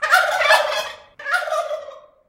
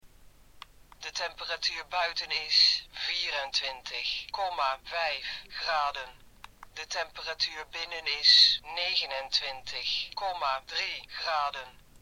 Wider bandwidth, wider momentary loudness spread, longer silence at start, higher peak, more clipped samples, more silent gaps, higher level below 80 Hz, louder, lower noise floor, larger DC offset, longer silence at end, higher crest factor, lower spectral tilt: second, 16 kHz vs over 20 kHz; about the same, 16 LU vs 15 LU; about the same, 0 s vs 0.05 s; first, 0 dBFS vs -6 dBFS; neither; neither; about the same, -64 dBFS vs -60 dBFS; first, -18 LUFS vs -28 LUFS; second, -39 dBFS vs -55 dBFS; neither; about the same, 0.3 s vs 0.3 s; about the same, 20 dB vs 24 dB; about the same, 1.5 dB/octave vs 1 dB/octave